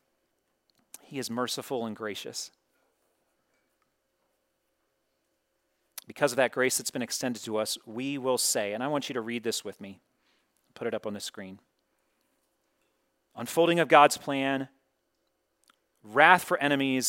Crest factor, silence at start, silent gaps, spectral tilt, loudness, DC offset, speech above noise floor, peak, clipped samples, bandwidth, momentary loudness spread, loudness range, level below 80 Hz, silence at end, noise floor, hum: 28 dB; 1.1 s; none; -3 dB/octave; -27 LUFS; under 0.1%; 49 dB; -4 dBFS; under 0.1%; 16.5 kHz; 22 LU; 16 LU; -82 dBFS; 0 s; -77 dBFS; none